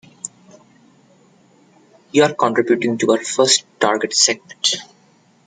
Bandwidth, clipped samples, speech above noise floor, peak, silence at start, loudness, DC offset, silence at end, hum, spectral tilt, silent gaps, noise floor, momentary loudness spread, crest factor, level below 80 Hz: 9.6 kHz; under 0.1%; 37 dB; 0 dBFS; 0.25 s; -16 LUFS; under 0.1%; 0.6 s; none; -2 dB/octave; none; -54 dBFS; 10 LU; 20 dB; -66 dBFS